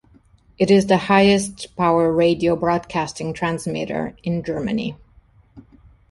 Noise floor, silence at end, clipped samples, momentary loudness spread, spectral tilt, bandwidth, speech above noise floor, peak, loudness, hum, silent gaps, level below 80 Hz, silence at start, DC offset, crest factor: -53 dBFS; 0.5 s; under 0.1%; 11 LU; -5.5 dB/octave; 11.5 kHz; 34 dB; -2 dBFS; -19 LUFS; none; none; -48 dBFS; 0.6 s; under 0.1%; 18 dB